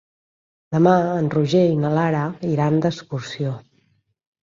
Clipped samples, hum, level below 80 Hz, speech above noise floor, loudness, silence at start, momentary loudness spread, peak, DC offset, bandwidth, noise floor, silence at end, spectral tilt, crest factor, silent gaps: under 0.1%; none; -60 dBFS; 45 dB; -20 LUFS; 0.7 s; 11 LU; -4 dBFS; under 0.1%; 7.6 kHz; -64 dBFS; 0.9 s; -7.5 dB/octave; 18 dB; none